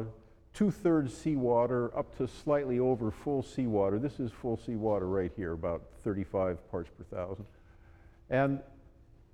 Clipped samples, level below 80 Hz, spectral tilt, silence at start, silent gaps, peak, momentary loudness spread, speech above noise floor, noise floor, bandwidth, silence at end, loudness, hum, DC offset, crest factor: under 0.1%; -54 dBFS; -8 dB/octave; 0 s; none; -16 dBFS; 12 LU; 26 dB; -58 dBFS; 12 kHz; 0.55 s; -33 LUFS; none; under 0.1%; 16 dB